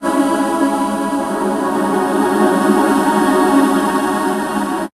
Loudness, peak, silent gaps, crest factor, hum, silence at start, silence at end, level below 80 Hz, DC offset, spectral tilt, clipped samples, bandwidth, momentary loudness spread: -15 LUFS; 0 dBFS; none; 14 dB; none; 0 s; 0.1 s; -50 dBFS; under 0.1%; -5 dB/octave; under 0.1%; 14.5 kHz; 6 LU